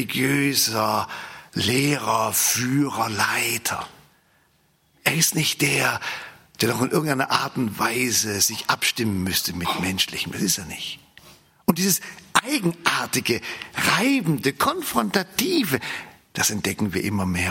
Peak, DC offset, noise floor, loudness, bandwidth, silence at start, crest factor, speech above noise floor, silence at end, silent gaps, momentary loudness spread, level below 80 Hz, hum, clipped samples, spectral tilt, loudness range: 0 dBFS; under 0.1%; -63 dBFS; -22 LUFS; 16.5 kHz; 0 s; 24 dB; 40 dB; 0 s; none; 9 LU; -60 dBFS; none; under 0.1%; -3 dB/octave; 2 LU